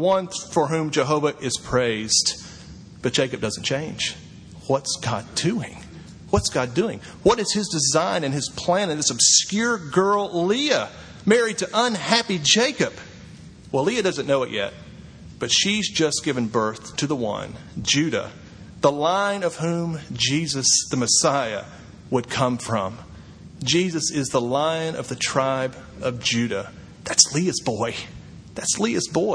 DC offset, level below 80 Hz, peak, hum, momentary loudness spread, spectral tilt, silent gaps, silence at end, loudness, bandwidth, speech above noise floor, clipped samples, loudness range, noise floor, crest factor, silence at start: under 0.1%; -50 dBFS; 0 dBFS; none; 13 LU; -3 dB/octave; none; 0 s; -22 LUFS; 11 kHz; 20 dB; under 0.1%; 5 LU; -42 dBFS; 24 dB; 0 s